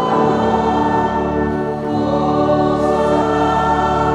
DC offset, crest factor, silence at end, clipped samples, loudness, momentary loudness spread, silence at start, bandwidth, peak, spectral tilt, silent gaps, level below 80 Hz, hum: under 0.1%; 12 dB; 0 s; under 0.1%; -16 LUFS; 4 LU; 0 s; 11 kHz; -4 dBFS; -7 dB/octave; none; -34 dBFS; none